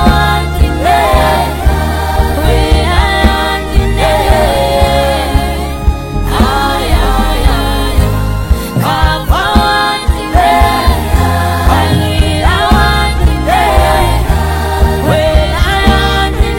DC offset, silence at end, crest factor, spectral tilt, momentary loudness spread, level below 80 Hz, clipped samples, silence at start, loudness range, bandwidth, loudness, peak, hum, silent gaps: under 0.1%; 0 s; 10 dB; -5.5 dB/octave; 4 LU; -14 dBFS; 0.9%; 0 s; 2 LU; 17 kHz; -11 LUFS; 0 dBFS; none; none